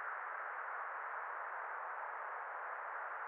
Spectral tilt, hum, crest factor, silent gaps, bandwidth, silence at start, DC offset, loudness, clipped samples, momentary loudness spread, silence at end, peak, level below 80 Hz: 5 dB/octave; none; 12 dB; none; 4.2 kHz; 0 s; under 0.1%; -44 LUFS; under 0.1%; 1 LU; 0 s; -32 dBFS; under -90 dBFS